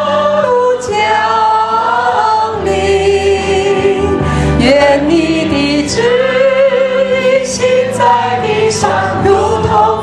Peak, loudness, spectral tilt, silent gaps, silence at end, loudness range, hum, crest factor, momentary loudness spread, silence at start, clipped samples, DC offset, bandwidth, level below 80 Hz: 0 dBFS; -11 LUFS; -5 dB/octave; none; 0 s; 1 LU; none; 10 dB; 3 LU; 0 s; under 0.1%; under 0.1%; 12 kHz; -30 dBFS